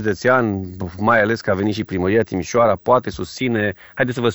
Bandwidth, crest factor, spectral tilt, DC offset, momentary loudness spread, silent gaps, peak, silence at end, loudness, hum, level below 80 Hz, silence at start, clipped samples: over 20 kHz; 16 dB; -6 dB/octave; under 0.1%; 8 LU; none; -2 dBFS; 0 s; -19 LUFS; none; -48 dBFS; 0 s; under 0.1%